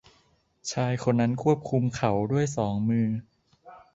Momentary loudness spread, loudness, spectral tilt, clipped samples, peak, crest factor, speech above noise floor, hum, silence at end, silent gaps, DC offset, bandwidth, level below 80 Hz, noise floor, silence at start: 6 LU; -26 LUFS; -6.5 dB/octave; under 0.1%; -8 dBFS; 18 dB; 40 dB; none; 0.15 s; none; under 0.1%; 8 kHz; -58 dBFS; -66 dBFS; 0.65 s